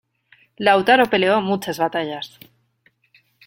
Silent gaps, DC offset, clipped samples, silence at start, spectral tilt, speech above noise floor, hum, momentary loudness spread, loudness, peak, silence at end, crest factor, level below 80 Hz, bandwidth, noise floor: none; under 0.1%; under 0.1%; 0.6 s; -5 dB/octave; 44 dB; none; 14 LU; -18 LUFS; -2 dBFS; 1.2 s; 18 dB; -62 dBFS; 16.5 kHz; -62 dBFS